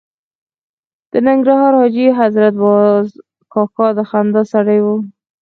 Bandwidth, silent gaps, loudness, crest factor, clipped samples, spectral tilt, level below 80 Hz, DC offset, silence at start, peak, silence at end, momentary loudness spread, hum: 6.4 kHz; none; -13 LUFS; 12 dB; under 0.1%; -9 dB/octave; -64 dBFS; under 0.1%; 1.15 s; 0 dBFS; 0.3 s; 9 LU; none